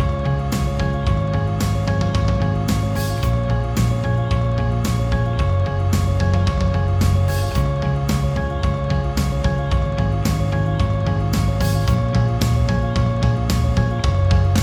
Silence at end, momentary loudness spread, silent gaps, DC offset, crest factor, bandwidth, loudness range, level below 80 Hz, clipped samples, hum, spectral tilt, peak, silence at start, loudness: 0 s; 3 LU; none; under 0.1%; 14 dB; 19.5 kHz; 1 LU; -24 dBFS; under 0.1%; none; -6.5 dB/octave; -4 dBFS; 0 s; -20 LUFS